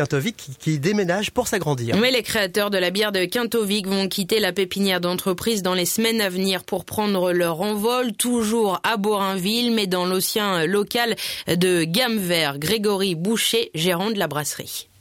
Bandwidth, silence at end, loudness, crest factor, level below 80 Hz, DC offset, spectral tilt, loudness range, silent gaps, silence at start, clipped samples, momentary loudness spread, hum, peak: 17 kHz; 0.2 s; -21 LUFS; 16 dB; -56 dBFS; under 0.1%; -4 dB/octave; 1 LU; none; 0 s; under 0.1%; 4 LU; none; -6 dBFS